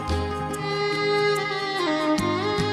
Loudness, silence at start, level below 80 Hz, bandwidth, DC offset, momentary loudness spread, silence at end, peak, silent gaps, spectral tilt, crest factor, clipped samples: -24 LUFS; 0 s; -42 dBFS; 14.5 kHz; under 0.1%; 5 LU; 0 s; -12 dBFS; none; -5 dB/octave; 14 dB; under 0.1%